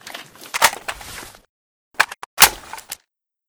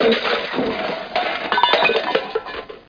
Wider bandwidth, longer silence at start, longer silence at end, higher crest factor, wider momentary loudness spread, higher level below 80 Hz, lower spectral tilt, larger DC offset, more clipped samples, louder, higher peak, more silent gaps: first, over 20 kHz vs 5.2 kHz; about the same, 0.05 s vs 0 s; first, 0.55 s vs 0.1 s; about the same, 22 dB vs 20 dB; first, 23 LU vs 11 LU; about the same, -50 dBFS vs -54 dBFS; second, 1 dB/octave vs -4.5 dB/octave; neither; neither; first, -16 LUFS vs -19 LUFS; about the same, 0 dBFS vs 0 dBFS; first, 1.49-1.91 s, 2.26-2.37 s vs none